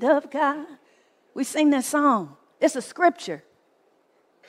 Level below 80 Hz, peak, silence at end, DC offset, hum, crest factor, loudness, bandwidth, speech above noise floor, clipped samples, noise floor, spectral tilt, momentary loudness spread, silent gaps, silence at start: -78 dBFS; -6 dBFS; 1.1 s; under 0.1%; none; 18 dB; -23 LUFS; 15.5 kHz; 41 dB; under 0.1%; -64 dBFS; -3.5 dB/octave; 17 LU; none; 0 s